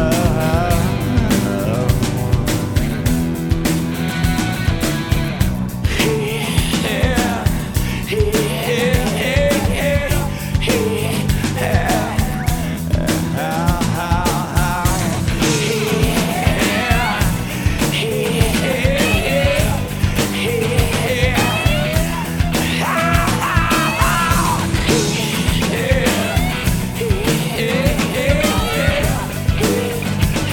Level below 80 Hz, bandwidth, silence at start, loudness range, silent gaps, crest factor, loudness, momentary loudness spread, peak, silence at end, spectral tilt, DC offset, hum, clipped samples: -24 dBFS; over 20 kHz; 0 s; 2 LU; none; 16 dB; -17 LUFS; 4 LU; 0 dBFS; 0 s; -5 dB/octave; under 0.1%; none; under 0.1%